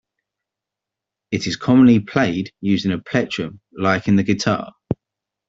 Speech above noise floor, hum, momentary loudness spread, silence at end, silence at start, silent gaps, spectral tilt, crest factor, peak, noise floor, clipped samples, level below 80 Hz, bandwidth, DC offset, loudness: 68 dB; none; 15 LU; 0.55 s; 1.3 s; none; -6 dB/octave; 18 dB; -2 dBFS; -85 dBFS; under 0.1%; -52 dBFS; 7.8 kHz; under 0.1%; -19 LUFS